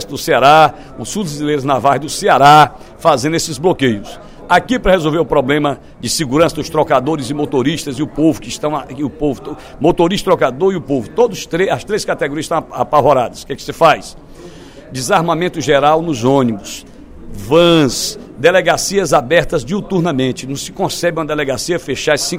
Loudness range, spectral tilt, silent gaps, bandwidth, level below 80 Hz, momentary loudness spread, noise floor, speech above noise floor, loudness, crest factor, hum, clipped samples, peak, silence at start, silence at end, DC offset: 4 LU; -4.5 dB/octave; none; 16.5 kHz; -38 dBFS; 11 LU; -35 dBFS; 21 dB; -14 LUFS; 14 dB; none; 0.1%; 0 dBFS; 0 s; 0 s; under 0.1%